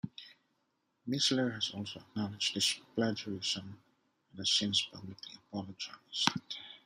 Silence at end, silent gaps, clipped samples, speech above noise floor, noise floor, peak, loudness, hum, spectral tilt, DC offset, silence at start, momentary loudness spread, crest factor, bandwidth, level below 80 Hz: 0.1 s; none; under 0.1%; 44 dB; -79 dBFS; -6 dBFS; -34 LUFS; none; -3 dB/octave; under 0.1%; 0.05 s; 16 LU; 32 dB; 15 kHz; -78 dBFS